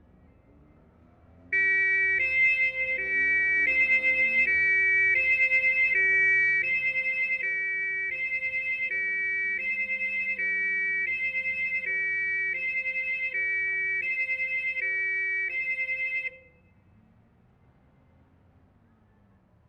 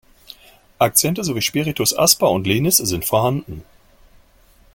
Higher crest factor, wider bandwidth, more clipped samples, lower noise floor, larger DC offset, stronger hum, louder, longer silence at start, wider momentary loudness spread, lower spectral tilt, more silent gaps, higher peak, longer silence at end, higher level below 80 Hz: second, 14 dB vs 20 dB; second, 8.8 kHz vs 17 kHz; neither; first, -61 dBFS vs -52 dBFS; neither; neither; second, -24 LUFS vs -17 LUFS; first, 1.5 s vs 0.8 s; about the same, 7 LU vs 8 LU; about the same, -3.5 dB/octave vs -3.5 dB/octave; neither; second, -14 dBFS vs 0 dBFS; first, 3.3 s vs 1.1 s; second, -62 dBFS vs -48 dBFS